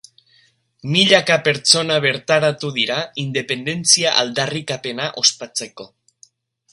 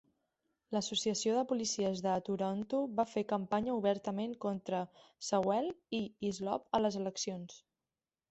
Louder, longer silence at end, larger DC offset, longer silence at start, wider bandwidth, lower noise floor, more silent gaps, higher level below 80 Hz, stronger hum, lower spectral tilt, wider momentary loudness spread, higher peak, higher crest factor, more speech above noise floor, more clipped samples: first, -17 LUFS vs -36 LUFS; first, 0.85 s vs 0.7 s; neither; first, 0.85 s vs 0.7 s; first, 16 kHz vs 8.2 kHz; second, -58 dBFS vs under -90 dBFS; neither; first, -64 dBFS vs -72 dBFS; neither; second, -2.5 dB/octave vs -4.5 dB/octave; first, 12 LU vs 7 LU; first, 0 dBFS vs -16 dBFS; about the same, 20 dB vs 20 dB; second, 39 dB vs over 55 dB; neither